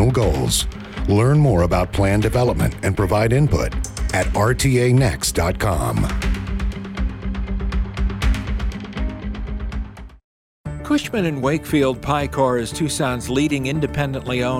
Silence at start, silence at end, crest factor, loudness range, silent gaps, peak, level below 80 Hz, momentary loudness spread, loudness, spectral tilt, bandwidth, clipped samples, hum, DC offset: 0 s; 0 s; 14 dB; 8 LU; 10.24-10.64 s; -6 dBFS; -26 dBFS; 11 LU; -20 LUFS; -5.5 dB/octave; 16.5 kHz; under 0.1%; none; under 0.1%